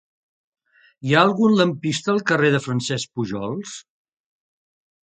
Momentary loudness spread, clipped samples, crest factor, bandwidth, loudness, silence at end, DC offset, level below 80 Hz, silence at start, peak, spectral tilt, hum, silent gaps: 15 LU; under 0.1%; 22 dB; 9.4 kHz; -20 LUFS; 1.25 s; under 0.1%; -62 dBFS; 1.05 s; 0 dBFS; -5 dB/octave; none; none